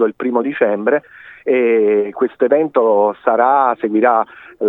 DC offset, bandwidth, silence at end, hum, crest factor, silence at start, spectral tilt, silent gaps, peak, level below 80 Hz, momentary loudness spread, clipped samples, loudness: under 0.1%; 3.9 kHz; 0 s; none; 14 dB; 0 s; -9 dB/octave; none; 0 dBFS; -68 dBFS; 5 LU; under 0.1%; -15 LUFS